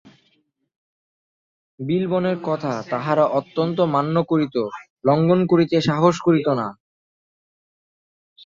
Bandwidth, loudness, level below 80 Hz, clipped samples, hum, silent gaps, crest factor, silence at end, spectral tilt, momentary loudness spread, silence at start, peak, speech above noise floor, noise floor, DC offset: 7.6 kHz; -20 LUFS; -62 dBFS; under 0.1%; none; 4.90-4.96 s; 18 dB; 1.7 s; -7.5 dB/octave; 8 LU; 1.8 s; -4 dBFS; 47 dB; -66 dBFS; under 0.1%